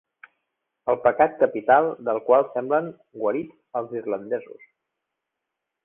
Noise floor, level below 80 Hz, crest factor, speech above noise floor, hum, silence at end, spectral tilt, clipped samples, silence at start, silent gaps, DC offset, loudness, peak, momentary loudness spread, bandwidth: -83 dBFS; -66 dBFS; 20 dB; 61 dB; none; 1.3 s; -9.5 dB/octave; under 0.1%; 0.85 s; none; under 0.1%; -23 LUFS; -4 dBFS; 12 LU; 3.6 kHz